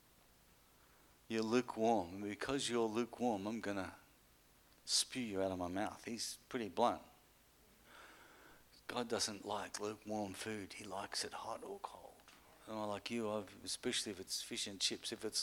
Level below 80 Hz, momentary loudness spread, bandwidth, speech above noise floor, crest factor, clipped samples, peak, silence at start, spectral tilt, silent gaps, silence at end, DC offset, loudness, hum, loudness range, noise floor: -74 dBFS; 15 LU; 19 kHz; 28 dB; 22 dB; under 0.1%; -20 dBFS; 1.3 s; -3 dB/octave; none; 0 s; under 0.1%; -41 LUFS; none; 6 LU; -69 dBFS